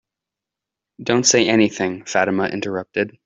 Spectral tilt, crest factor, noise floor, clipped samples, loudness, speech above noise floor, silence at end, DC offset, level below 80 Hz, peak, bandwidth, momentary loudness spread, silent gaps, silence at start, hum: -3 dB/octave; 18 dB; -85 dBFS; under 0.1%; -18 LUFS; 67 dB; 0.15 s; under 0.1%; -60 dBFS; -2 dBFS; 8.2 kHz; 10 LU; none; 1 s; none